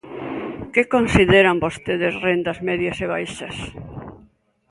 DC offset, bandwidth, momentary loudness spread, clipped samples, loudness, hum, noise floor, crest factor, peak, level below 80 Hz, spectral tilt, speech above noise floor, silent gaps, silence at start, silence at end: under 0.1%; 11.5 kHz; 18 LU; under 0.1%; -19 LUFS; none; -55 dBFS; 20 dB; 0 dBFS; -40 dBFS; -5.5 dB/octave; 36 dB; none; 0.05 s; 0.55 s